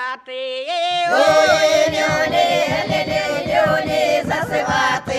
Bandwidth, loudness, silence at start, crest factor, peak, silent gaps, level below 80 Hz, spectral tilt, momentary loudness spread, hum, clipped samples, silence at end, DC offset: 14.5 kHz; -17 LUFS; 0 s; 14 dB; -2 dBFS; none; -48 dBFS; -3.5 dB/octave; 8 LU; none; under 0.1%; 0 s; under 0.1%